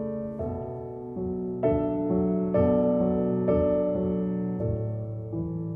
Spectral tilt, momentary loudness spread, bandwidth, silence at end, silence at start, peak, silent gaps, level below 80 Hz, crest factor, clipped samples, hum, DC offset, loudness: -12.5 dB/octave; 11 LU; 3.3 kHz; 0 s; 0 s; -10 dBFS; none; -48 dBFS; 16 dB; under 0.1%; none; under 0.1%; -27 LUFS